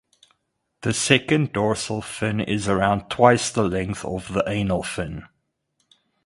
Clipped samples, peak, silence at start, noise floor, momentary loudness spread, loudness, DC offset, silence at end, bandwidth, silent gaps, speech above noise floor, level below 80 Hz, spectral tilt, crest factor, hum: under 0.1%; 0 dBFS; 0.8 s; -74 dBFS; 12 LU; -22 LUFS; under 0.1%; 1 s; 11.5 kHz; none; 53 dB; -46 dBFS; -4.5 dB/octave; 24 dB; none